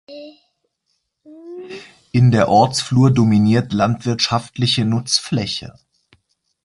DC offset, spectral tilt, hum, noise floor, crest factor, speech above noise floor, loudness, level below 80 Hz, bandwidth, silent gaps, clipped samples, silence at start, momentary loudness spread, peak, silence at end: under 0.1%; -5.5 dB/octave; none; -71 dBFS; 18 dB; 55 dB; -16 LUFS; -48 dBFS; 11.5 kHz; none; under 0.1%; 0.1 s; 22 LU; -2 dBFS; 0.95 s